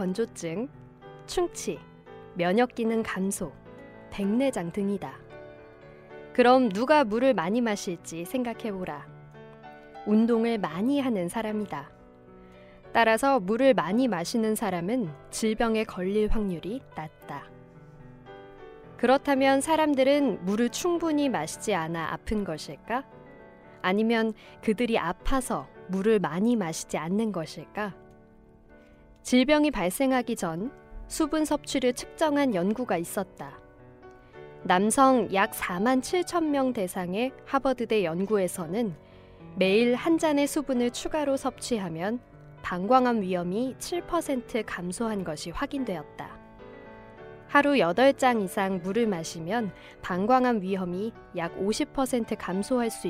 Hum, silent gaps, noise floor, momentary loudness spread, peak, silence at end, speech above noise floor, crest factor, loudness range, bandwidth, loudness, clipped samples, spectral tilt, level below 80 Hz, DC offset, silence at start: none; none; -54 dBFS; 18 LU; -8 dBFS; 0 s; 28 dB; 20 dB; 5 LU; 16 kHz; -27 LUFS; under 0.1%; -5 dB/octave; -48 dBFS; under 0.1%; 0 s